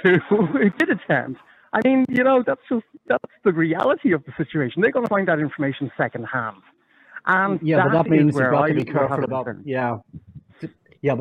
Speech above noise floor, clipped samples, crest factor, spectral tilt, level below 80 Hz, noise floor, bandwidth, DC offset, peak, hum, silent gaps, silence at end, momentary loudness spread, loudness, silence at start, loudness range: 24 dB; under 0.1%; 16 dB; -8.5 dB/octave; -62 dBFS; -44 dBFS; 9.4 kHz; under 0.1%; -4 dBFS; none; none; 0 s; 10 LU; -21 LUFS; 0 s; 3 LU